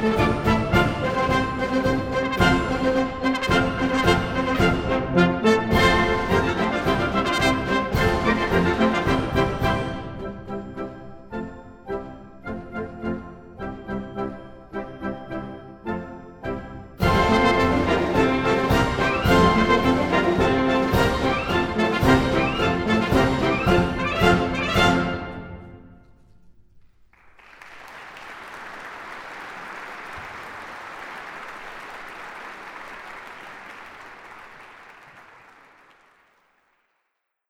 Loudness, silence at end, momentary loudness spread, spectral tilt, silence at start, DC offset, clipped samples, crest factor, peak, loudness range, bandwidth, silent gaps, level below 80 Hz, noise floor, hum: -21 LUFS; 2.3 s; 19 LU; -6 dB/octave; 0 s; under 0.1%; under 0.1%; 20 dB; -2 dBFS; 19 LU; 16.5 kHz; none; -36 dBFS; -77 dBFS; none